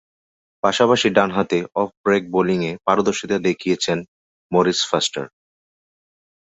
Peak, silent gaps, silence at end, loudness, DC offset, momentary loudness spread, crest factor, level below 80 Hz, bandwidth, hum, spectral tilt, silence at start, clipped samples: -2 dBFS; 1.97-2.04 s, 4.08-4.50 s; 1.2 s; -19 LUFS; under 0.1%; 7 LU; 20 dB; -58 dBFS; 8.2 kHz; none; -4.5 dB/octave; 0.65 s; under 0.1%